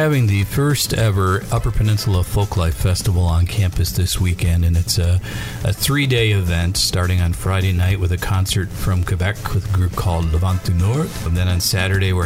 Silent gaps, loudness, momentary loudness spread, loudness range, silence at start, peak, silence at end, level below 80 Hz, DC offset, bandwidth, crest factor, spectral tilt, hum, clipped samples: none; -18 LUFS; 4 LU; 2 LU; 0 s; -4 dBFS; 0 s; -28 dBFS; under 0.1%; 16.5 kHz; 12 dB; -5 dB/octave; none; under 0.1%